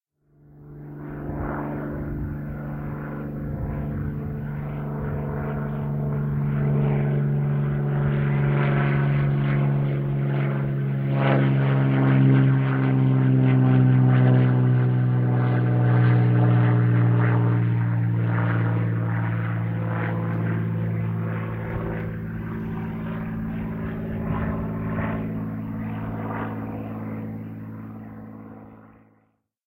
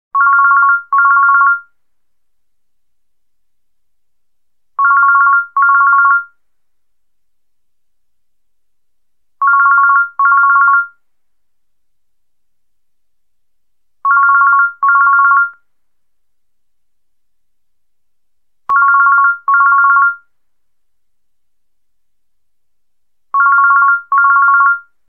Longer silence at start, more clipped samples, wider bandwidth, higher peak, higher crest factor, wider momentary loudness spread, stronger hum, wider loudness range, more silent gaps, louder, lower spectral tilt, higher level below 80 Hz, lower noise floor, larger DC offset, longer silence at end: first, 0.55 s vs 0.15 s; neither; first, 3.9 kHz vs 2.4 kHz; second, -6 dBFS vs 0 dBFS; about the same, 16 dB vs 14 dB; first, 13 LU vs 7 LU; neither; first, 12 LU vs 7 LU; neither; second, -23 LUFS vs -9 LUFS; first, -11.5 dB/octave vs -3 dB/octave; first, -44 dBFS vs -74 dBFS; second, -67 dBFS vs -78 dBFS; second, under 0.1% vs 0.2%; first, 0.8 s vs 0.3 s